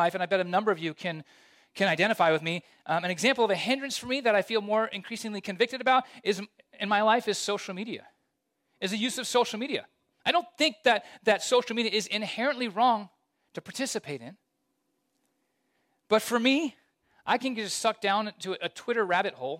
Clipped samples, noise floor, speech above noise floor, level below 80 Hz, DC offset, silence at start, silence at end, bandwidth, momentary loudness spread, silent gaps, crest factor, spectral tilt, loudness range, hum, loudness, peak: under 0.1%; -78 dBFS; 50 dB; -78 dBFS; under 0.1%; 0 s; 0 s; 16 kHz; 11 LU; none; 18 dB; -3.5 dB/octave; 5 LU; none; -28 LUFS; -10 dBFS